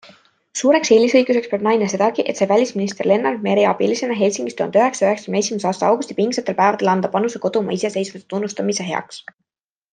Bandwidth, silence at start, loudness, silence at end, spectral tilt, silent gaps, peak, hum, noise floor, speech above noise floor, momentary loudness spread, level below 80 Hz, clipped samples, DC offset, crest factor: 9.8 kHz; 0.55 s; -18 LUFS; 0.7 s; -4.5 dB/octave; none; -2 dBFS; none; -50 dBFS; 32 dB; 8 LU; -68 dBFS; under 0.1%; under 0.1%; 16 dB